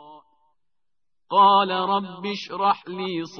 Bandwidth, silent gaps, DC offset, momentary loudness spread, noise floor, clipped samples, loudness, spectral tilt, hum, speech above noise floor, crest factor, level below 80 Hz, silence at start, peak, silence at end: 6.6 kHz; none; under 0.1%; 14 LU; -88 dBFS; under 0.1%; -21 LUFS; -5.5 dB/octave; none; 66 dB; 18 dB; -72 dBFS; 0.05 s; -6 dBFS; 0 s